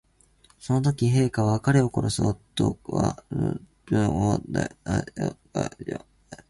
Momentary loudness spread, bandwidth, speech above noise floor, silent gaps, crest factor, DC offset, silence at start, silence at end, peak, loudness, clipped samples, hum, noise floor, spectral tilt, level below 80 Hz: 10 LU; 11.5 kHz; 35 dB; none; 20 dB; under 0.1%; 0.65 s; 0.15 s; -6 dBFS; -26 LUFS; under 0.1%; none; -60 dBFS; -6.5 dB/octave; -46 dBFS